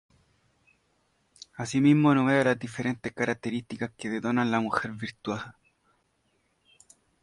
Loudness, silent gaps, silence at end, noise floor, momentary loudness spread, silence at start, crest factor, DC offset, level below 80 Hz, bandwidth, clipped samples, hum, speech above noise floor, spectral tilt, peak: -27 LUFS; none; 1.7 s; -72 dBFS; 15 LU; 1.6 s; 20 dB; under 0.1%; -66 dBFS; 11.5 kHz; under 0.1%; none; 45 dB; -6.5 dB/octave; -8 dBFS